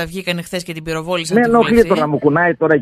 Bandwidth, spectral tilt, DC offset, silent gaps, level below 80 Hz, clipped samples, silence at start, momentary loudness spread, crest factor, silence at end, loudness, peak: 14 kHz; -5.5 dB/octave; under 0.1%; none; -42 dBFS; under 0.1%; 0 s; 12 LU; 14 dB; 0 s; -15 LUFS; 0 dBFS